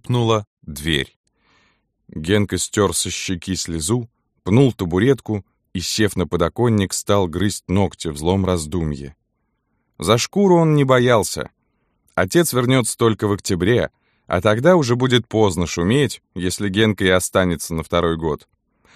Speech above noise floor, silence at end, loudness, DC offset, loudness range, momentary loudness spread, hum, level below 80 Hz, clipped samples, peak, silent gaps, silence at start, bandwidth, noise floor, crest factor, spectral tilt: 53 dB; 0.6 s; -19 LUFS; under 0.1%; 4 LU; 12 LU; none; -42 dBFS; under 0.1%; -2 dBFS; 0.47-0.57 s, 1.16-1.24 s; 0.05 s; 15.5 kHz; -71 dBFS; 18 dB; -5 dB/octave